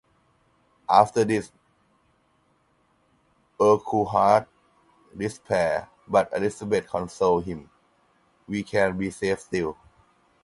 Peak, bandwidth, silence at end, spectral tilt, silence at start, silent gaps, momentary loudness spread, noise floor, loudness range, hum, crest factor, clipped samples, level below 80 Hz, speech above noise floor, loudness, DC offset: -2 dBFS; 11.5 kHz; 0.7 s; -6 dB/octave; 0.9 s; none; 13 LU; -66 dBFS; 3 LU; none; 24 dB; under 0.1%; -56 dBFS; 43 dB; -24 LUFS; under 0.1%